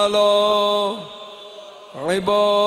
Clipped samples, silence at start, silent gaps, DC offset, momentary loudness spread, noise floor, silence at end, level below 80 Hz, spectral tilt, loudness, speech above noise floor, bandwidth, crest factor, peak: under 0.1%; 0 s; none; under 0.1%; 22 LU; -39 dBFS; 0 s; -60 dBFS; -4 dB/octave; -18 LUFS; 21 dB; 13.5 kHz; 14 dB; -6 dBFS